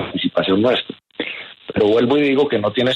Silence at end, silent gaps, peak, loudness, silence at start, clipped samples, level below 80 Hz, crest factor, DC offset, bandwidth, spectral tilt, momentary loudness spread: 0 s; none; -4 dBFS; -18 LUFS; 0 s; under 0.1%; -54 dBFS; 12 dB; under 0.1%; 8 kHz; -7 dB/octave; 12 LU